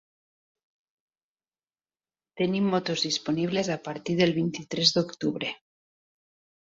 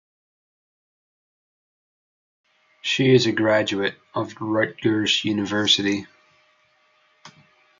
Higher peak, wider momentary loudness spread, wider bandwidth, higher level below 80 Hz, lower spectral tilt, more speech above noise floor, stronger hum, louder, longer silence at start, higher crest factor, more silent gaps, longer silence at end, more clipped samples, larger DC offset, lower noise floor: about the same, -6 dBFS vs -4 dBFS; about the same, 9 LU vs 11 LU; about the same, 7.8 kHz vs 7.6 kHz; about the same, -68 dBFS vs -70 dBFS; about the same, -4.5 dB/octave vs -4.5 dB/octave; first, over 63 dB vs 41 dB; neither; second, -27 LUFS vs -21 LUFS; second, 2.35 s vs 2.85 s; about the same, 24 dB vs 20 dB; neither; first, 1.1 s vs 0.5 s; neither; neither; first, under -90 dBFS vs -62 dBFS